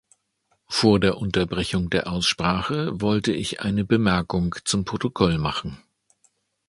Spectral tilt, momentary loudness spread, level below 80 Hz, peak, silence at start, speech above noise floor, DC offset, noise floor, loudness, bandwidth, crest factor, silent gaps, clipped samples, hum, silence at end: -5 dB/octave; 6 LU; -44 dBFS; -2 dBFS; 0.7 s; 48 dB; under 0.1%; -70 dBFS; -23 LUFS; 11.5 kHz; 22 dB; none; under 0.1%; none; 0.9 s